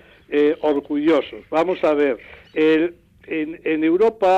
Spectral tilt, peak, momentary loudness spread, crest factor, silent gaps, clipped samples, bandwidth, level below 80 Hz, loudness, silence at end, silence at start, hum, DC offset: -6.5 dB/octave; -8 dBFS; 9 LU; 10 dB; none; under 0.1%; 7.8 kHz; -58 dBFS; -20 LUFS; 0 s; 0.3 s; none; under 0.1%